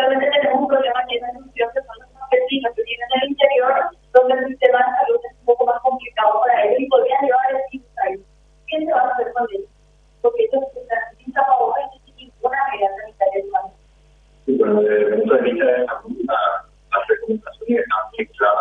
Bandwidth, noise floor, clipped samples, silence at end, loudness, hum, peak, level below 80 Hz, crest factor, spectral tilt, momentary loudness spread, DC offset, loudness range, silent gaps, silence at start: 3.9 kHz; -53 dBFS; under 0.1%; 0 s; -19 LUFS; none; 0 dBFS; -56 dBFS; 18 dB; -6 dB/octave; 10 LU; under 0.1%; 5 LU; none; 0 s